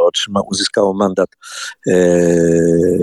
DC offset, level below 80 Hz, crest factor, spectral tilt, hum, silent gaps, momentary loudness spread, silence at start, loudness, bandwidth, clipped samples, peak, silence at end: under 0.1%; -46 dBFS; 14 dB; -5 dB/octave; none; none; 10 LU; 0 s; -14 LUFS; 12.5 kHz; under 0.1%; 0 dBFS; 0 s